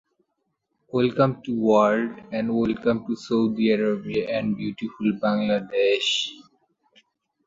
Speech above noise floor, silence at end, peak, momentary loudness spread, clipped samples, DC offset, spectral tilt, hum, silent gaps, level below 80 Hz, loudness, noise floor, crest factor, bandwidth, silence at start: 53 dB; 1.05 s; -6 dBFS; 8 LU; under 0.1%; under 0.1%; -5.5 dB/octave; none; none; -60 dBFS; -23 LUFS; -76 dBFS; 20 dB; 7.8 kHz; 0.95 s